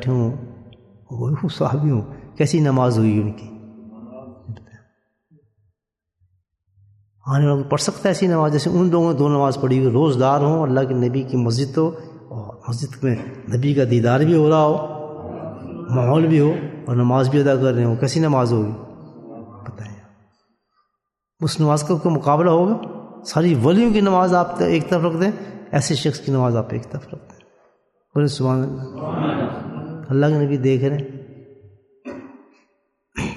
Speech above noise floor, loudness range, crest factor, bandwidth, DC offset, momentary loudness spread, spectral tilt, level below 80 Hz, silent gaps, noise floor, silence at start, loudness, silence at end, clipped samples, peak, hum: 62 dB; 7 LU; 16 dB; 12 kHz; under 0.1%; 21 LU; -7 dB/octave; -54 dBFS; none; -80 dBFS; 0 s; -19 LUFS; 0 s; under 0.1%; -4 dBFS; none